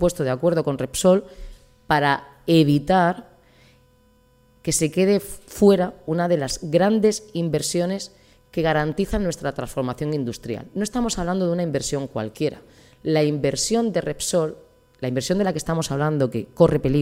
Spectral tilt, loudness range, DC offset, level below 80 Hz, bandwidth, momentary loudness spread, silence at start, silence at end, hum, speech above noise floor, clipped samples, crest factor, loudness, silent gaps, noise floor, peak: -5.5 dB/octave; 5 LU; under 0.1%; -44 dBFS; 16 kHz; 10 LU; 0 s; 0 s; none; 36 dB; under 0.1%; 20 dB; -22 LUFS; none; -57 dBFS; -2 dBFS